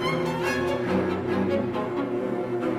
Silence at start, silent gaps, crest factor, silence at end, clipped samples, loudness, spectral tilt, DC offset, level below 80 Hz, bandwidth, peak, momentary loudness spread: 0 s; none; 14 dB; 0 s; under 0.1%; -26 LUFS; -6.5 dB/octave; under 0.1%; -56 dBFS; 15 kHz; -12 dBFS; 3 LU